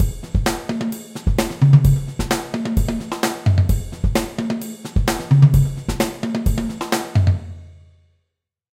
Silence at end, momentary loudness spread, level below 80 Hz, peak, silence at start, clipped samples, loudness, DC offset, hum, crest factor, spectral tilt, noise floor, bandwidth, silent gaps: 1 s; 11 LU; -26 dBFS; 0 dBFS; 0 s; under 0.1%; -19 LUFS; under 0.1%; none; 18 dB; -6.5 dB/octave; -77 dBFS; 16.5 kHz; none